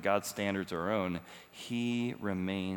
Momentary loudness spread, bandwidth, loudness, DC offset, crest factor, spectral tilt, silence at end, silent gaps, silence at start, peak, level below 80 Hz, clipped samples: 9 LU; over 20 kHz; -35 LUFS; under 0.1%; 20 dB; -5.5 dB/octave; 0 s; none; 0 s; -16 dBFS; -72 dBFS; under 0.1%